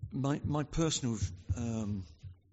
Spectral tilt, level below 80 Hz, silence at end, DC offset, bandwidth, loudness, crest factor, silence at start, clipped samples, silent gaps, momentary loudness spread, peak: -6.5 dB/octave; -48 dBFS; 0.2 s; under 0.1%; 8 kHz; -35 LUFS; 16 dB; 0 s; under 0.1%; none; 10 LU; -18 dBFS